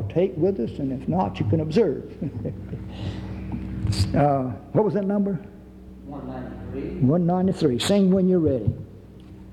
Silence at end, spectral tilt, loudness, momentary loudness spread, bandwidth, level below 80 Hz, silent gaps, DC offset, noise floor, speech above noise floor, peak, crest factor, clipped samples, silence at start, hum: 0 s; -7.5 dB/octave; -24 LUFS; 15 LU; 12.5 kHz; -44 dBFS; none; under 0.1%; -43 dBFS; 20 dB; -8 dBFS; 16 dB; under 0.1%; 0 s; none